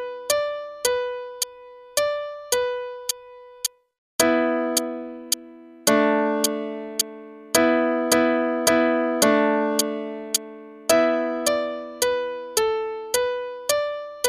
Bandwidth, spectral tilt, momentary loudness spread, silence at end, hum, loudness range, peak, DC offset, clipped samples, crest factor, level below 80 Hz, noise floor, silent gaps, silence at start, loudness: 15.5 kHz; -2 dB/octave; 10 LU; 0 s; none; 5 LU; -2 dBFS; under 0.1%; under 0.1%; 22 dB; -62 dBFS; -44 dBFS; 3.98-4.19 s; 0 s; -23 LUFS